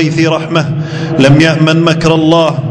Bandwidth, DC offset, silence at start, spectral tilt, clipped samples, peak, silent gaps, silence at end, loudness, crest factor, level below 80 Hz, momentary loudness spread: 11 kHz; under 0.1%; 0 s; -6.5 dB/octave; 2%; 0 dBFS; none; 0 s; -9 LUFS; 8 dB; -38 dBFS; 8 LU